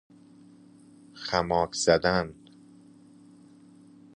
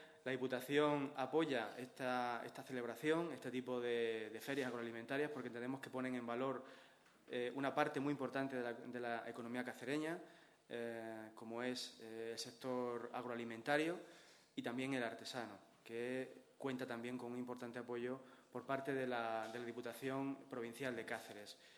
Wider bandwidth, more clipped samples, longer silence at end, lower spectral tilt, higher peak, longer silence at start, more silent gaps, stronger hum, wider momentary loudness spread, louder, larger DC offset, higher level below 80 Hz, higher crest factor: second, 11 kHz vs over 20 kHz; neither; first, 1.85 s vs 0 s; about the same, -4 dB/octave vs -5 dB/octave; first, -6 dBFS vs -20 dBFS; first, 1.15 s vs 0 s; neither; neither; about the same, 13 LU vs 11 LU; first, -26 LUFS vs -44 LUFS; neither; first, -54 dBFS vs -90 dBFS; about the same, 24 dB vs 24 dB